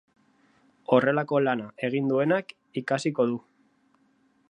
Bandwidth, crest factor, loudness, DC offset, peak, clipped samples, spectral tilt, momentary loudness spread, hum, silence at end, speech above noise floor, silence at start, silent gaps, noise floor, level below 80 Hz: 9.8 kHz; 22 dB; -26 LUFS; under 0.1%; -6 dBFS; under 0.1%; -6.5 dB/octave; 13 LU; none; 1.1 s; 41 dB; 0.9 s; none; -66 dBFS; -76 dBFS